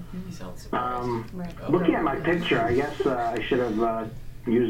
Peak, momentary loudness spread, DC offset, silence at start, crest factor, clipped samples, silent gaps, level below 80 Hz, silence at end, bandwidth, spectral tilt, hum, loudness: -8 dBFS; 14 LU; under 0.1%; 0 s; 18 dB; under 0.1%; none; -44 dBFS; 0 s; 16 kHz; -7 dB/octave; none; -26 LUFS